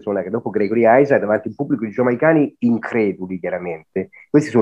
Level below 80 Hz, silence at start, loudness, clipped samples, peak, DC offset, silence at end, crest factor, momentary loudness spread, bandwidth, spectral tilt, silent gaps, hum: -62 dBFS; 0.05 s; -18 LUFS; under 0.1%; -2 dBFS; under 0.1%; 0 s; 16 dB; 12 LU; 9 kHz; -8 dB/octave; none; none